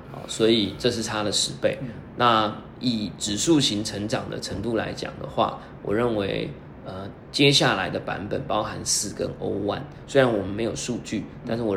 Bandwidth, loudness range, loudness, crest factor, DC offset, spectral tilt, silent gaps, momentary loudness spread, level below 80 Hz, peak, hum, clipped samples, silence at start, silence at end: 16 kHz; 3 LU; -24 LUFS; 22 dB; under 0.1%; -4 dB/octave; none; 13 LU; -50 dBFS; -4 dBFS; none; under 0.1%; 0 s; 0 s